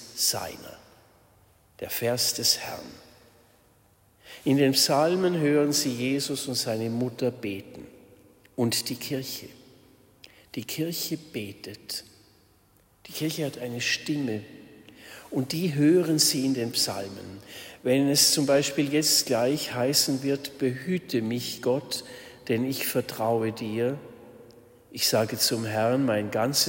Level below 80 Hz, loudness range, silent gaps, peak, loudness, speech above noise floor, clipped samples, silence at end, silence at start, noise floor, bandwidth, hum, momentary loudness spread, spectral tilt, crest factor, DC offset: -66 dBFS; 10 LU; none; -8 dBFS; -26 LUFS; 35 dB; under 0.1%; 0 s; 0 s; -62 dBFS; 16.5 kHz; none; 18 LU; -3.5 dB/octave; 20 dB; under 0.1%